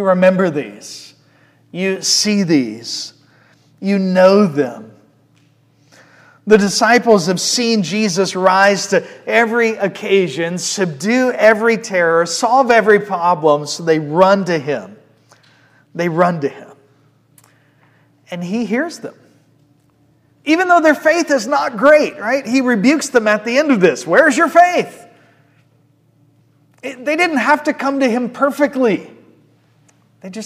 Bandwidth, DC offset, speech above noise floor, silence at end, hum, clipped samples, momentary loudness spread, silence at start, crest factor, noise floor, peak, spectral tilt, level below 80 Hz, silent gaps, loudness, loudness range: 15.5 kHz; under 0.1%; 41 dB; 0 s; none; 0.1%; 14 LU; 0 s; 16 dB; -55 dBFS; 0 dBFS; -4 dB/octave; -62 dBFS; none; -14 LUFS; 9 LU